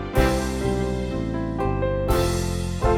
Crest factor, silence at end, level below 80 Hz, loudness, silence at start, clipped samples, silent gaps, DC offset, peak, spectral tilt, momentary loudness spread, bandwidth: 18 dB; 0 s; -30 dBFS; -24 LUFS; 0 s; under 0.1%; none; under 0.1%; -6 dBFS; -6 dB/octave; 5 LU; 18.5 kHz